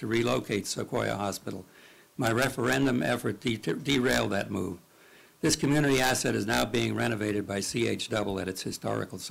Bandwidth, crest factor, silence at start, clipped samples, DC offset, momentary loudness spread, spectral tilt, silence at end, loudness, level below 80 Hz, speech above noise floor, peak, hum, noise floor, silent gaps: 16 kHz; 16 dB; 0 s; under 0.1%; under 0.1%; 9 LU; -4.5 dB/octave; 0 s; -29 LUFS; -54 dBFS; 28 dB; -14 dBFS; none; -56 dBFS; none